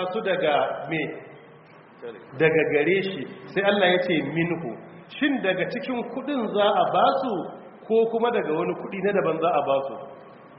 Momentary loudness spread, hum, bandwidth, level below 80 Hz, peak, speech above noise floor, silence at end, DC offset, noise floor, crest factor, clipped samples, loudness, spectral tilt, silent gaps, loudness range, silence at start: 18 LU; none; 5.6 kHz; -68 dBFS; -6 dBFS; 25 dB; 0 s; under 0.1%; -49 dBFS; 18 dB; under 0.1%; -24 LUFS; -3.5 dB/octave; none; 2 LU; 0 s